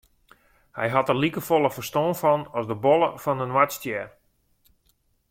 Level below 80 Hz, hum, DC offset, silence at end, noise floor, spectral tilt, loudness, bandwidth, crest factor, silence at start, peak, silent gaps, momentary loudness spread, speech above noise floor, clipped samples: -62 dBFS; none; under 0.1%; 1.25 s; -67 dBFS; -5.5 dB/octave; -24 LUFS; 16.5 kHz; 20 dB; 0.75 s; -4 dBFS; none; 10 LU; 44 dB; under 0.1%